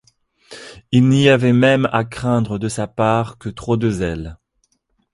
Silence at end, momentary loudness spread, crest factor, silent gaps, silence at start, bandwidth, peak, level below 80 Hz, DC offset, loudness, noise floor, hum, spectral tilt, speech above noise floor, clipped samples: 0.8 s; 17 LU; 18 dB; none; 0.5 s; 11.5 kHz; 0 dBFS; -44 dBFS; under 0.1%; -17 LUFS; -66 dBFS; none; -6.5 dB/octave; 50 dB; under 0.1%